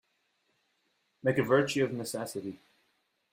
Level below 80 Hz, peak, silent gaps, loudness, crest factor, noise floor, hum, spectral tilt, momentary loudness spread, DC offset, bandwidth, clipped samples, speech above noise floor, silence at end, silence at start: -72 dBFS; -12 dBFS; none; -30 LUFS; 22 dB; -76 dBFS; none; -5 dB/octave; 13 LU; under 0.1%; 16 kHz; under 0.1%; 46 dB; 0.75 s; 1.25 s